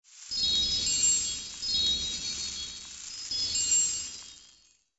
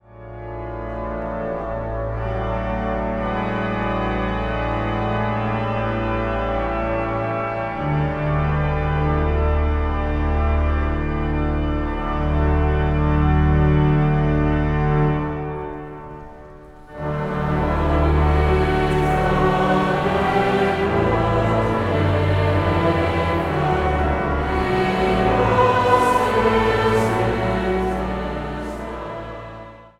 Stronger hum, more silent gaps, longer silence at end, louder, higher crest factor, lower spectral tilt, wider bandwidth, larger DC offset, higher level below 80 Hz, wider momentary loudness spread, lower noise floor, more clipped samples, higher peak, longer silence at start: neither; neither; first, 0.55 s vs 0.1 s; second, -26 LUFS vs -20 LUFS; about the same, 18 dB vs 18 dB; second, 1 dB/octave vs -7.5 dB/octave; second, 8.2 kHz vs 12 kHz; neither; second, -54 dBFS vs -26 dBFS; first, 15 LU vs 11 LU; first, -62 dBFS vs -41 dBFS; neither; second, -14 dBFS vs -2 dBFS; about the same, 0.1 s vs 0.1 s